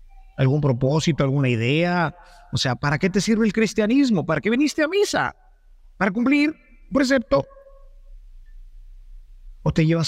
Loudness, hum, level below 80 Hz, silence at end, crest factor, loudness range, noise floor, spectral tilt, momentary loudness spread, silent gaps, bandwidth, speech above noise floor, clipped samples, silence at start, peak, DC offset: -21 LUFS; none; -44 dBFS; 0 s; 16 dB; 4 LU; -49 dBFS; -6 dB/octave; 6 LU; none; 14 kHz; 29 dB; under 0.1%; 0.2 s; -6 dBFS; under 0.1%